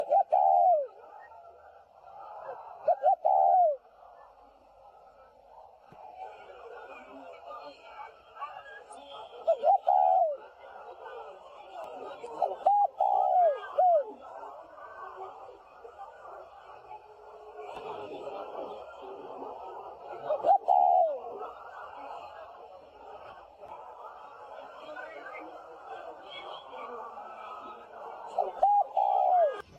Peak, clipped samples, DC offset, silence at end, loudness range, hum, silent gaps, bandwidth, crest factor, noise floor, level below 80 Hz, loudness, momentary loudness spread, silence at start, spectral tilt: -12 dBFS; under 0.1%; under 0.1%; 0.15 s; 18 LU; none; none; 7.6 kHz; 18 dB; -57 dBFS; -76 dBFS; -27 LUFS; 24 LU; 0 s; -4.5 dB/octave